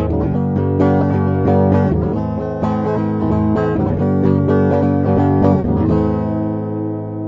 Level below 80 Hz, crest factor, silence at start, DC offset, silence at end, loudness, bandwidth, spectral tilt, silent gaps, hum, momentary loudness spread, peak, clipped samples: -32 dBFS; 14 dB; 0 s; under 0.1%; 0 s; -16 LUFS; 5.8 kHz; -11 dB/octave; none; none; 6 LU; -2 dBFS; under 0.1%